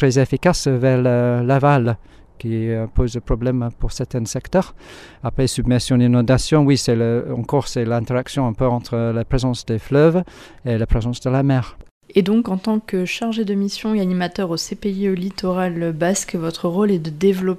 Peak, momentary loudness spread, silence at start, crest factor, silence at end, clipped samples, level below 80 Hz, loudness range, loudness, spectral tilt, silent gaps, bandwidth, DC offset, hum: -2 dBFS; 9 LU; 0 s; 16 dB; 0 s; under 0.1%; -34 dBFS; 4 LU; -19 LUFS; -6.5 dB/octave; 11.91-12.01 s; 14 kHz; under 0.1%; none